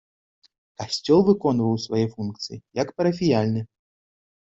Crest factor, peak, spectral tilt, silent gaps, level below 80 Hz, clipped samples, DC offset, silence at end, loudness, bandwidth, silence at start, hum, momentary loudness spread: 18 dB; -6 dBFS; -6.5 dB/octave; none; -58 dBFS; under 0.1%; under 0.1%; 0.75 s; -23 LUFS; 8 kHz; 0.8 s; none; 13 LU